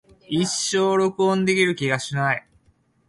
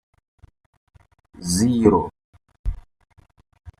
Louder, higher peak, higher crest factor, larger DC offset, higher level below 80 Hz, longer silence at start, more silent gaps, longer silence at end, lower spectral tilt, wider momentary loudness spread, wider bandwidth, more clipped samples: about the same, -21 LUFS vs -21 LUFS; second, -6 dBFS vs -2 dBFS; about the same, 18 dB vs 22 dB; neither; second, -62 dBFS vs -38 dBFS; second, 0.3 s vs 1.4 s; second, none vs 2.24-2.33 s, 2.59-2.64 s; first, 0.7 s vs 0.1 s; second, -4 dB/octave vs -6 dB/octave; second, 5 LU vs 18 LU; second, 11.5 kHz vs 14 kHz; neither